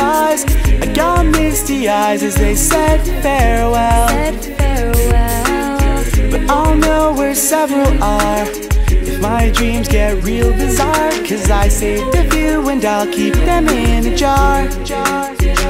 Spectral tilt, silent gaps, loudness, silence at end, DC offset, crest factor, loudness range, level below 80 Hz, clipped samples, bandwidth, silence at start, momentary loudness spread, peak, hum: -5 dB/octave; none; -14 LUFS; 0 s; under 0.1%; 12 dB; 1 LU; -16 dBFS; under 0.1%; 16.5 kHz; 0 s; 4 LU; 0 dBFS; none